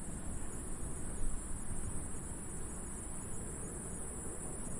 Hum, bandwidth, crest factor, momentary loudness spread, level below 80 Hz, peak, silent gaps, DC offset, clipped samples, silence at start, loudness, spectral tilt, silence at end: none; 11.5 kHz; 16 dB; 1 LU; -44 dBFS; -24 dBFS; none; under 0.1%; under 0.1%; 0 s; -43 LUFS; -4.5 dB/octave; 0 s